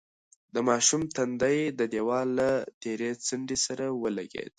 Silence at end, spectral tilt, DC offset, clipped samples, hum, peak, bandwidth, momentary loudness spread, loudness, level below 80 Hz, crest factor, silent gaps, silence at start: 0.1 s; -3 dB/octave; under 0.1%; under 0.1%; none; -10 dBFS; 11.5 kHz; 9 LU; -28 LUFS; -64 dBFS; 20 dB; 2.74-2.81 s; 0.55 s